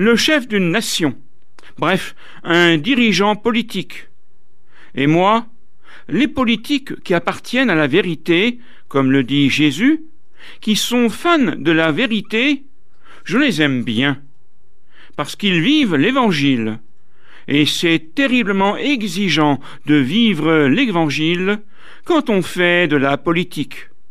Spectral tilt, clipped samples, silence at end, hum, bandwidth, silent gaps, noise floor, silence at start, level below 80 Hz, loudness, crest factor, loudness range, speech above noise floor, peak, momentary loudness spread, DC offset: -5 dB/octave; under 0.1%; 0.25 s; none; 14.5 kHz; none; -62 dBFS; 0 s; -54 dBFS; -16 LUFS; 14 dB; 3 LU; 46 dB; -2 dBFS; 11 LU; 3%